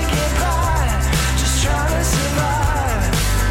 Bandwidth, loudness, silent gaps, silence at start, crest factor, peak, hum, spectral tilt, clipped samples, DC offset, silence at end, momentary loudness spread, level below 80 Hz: 16.5 kHz; -18 LUFS; none; 0 s; 14 dB; -4 dBFS; none; -4 dB/octave; under 0.1%; under 0.1%; 0 s; 1 LU; -20 dBFS